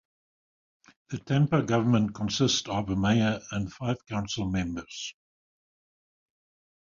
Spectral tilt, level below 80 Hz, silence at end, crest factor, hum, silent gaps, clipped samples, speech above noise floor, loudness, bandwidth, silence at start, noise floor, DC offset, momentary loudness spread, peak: -5.5 dB/octave; -52 dBFS; 1.7 s; 18 dB; none; none; under 0.1%; over 63 dB; -28 LUFS; 7.6 kHz; 1.1 s; under -90 dBFS; under 0.1%; 13 LU; -10 dBFS